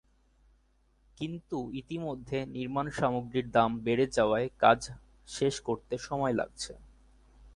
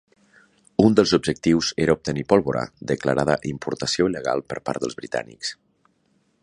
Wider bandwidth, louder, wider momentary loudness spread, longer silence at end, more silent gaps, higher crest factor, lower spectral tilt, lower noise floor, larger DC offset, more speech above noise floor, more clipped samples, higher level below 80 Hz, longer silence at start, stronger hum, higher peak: about the same, 11.5 kHz vs 11 kHz; second, -31 LUFS vs -22 LUFS; first, 14 LU vs 11 LU; second, 0.05 s vs 0.9 s; neither; about the same, 24 dB vs 22 dB; about the same, -5.5 dB/octave vs -5 dB/octave; about the same, -68 dBFS vs -66 dBFS; neither; second, 37 dB vs 44 dB; neither; second, -58 dBFS vs -50 dBFS; first, 1.2 s vs 0.8 s; neither; second, -8 dBFS vs -2 dBFS